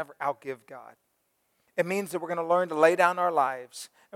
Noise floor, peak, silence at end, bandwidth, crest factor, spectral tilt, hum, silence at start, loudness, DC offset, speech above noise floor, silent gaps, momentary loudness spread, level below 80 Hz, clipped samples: -74 dBFS; -6 dBFS; 0.3 s; 16.5 kHz; 22 dB; -4.5 dB/octave; none; 0 s; -26 LUFS; under 0.1%; 47 dB; none; 20 LU; -86 dBFS; under 0.1%